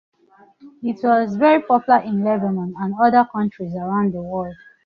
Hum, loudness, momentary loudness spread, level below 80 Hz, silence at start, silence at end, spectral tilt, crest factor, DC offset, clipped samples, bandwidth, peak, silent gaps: none; -19 LUFS; 12 LU; -58 dBFS; 0.65 s; 0.3 s; -9 dB/octave; 16 dB; under 0.1%; under 0.1%; 6.2 kHz; -2 dBFS; none